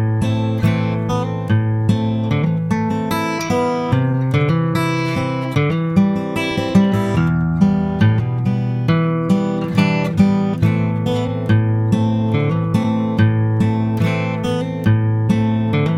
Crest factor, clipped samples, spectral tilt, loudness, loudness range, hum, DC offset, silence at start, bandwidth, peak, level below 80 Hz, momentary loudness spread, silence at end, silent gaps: 14 dB; under 0.1%; -8 dB/octave; -17 LUFS; 2 LU; none; under 0.1%; 0 s; 12.5 kHz; -2 dBFS; -42 dBFS; 4 LU; 0 s; none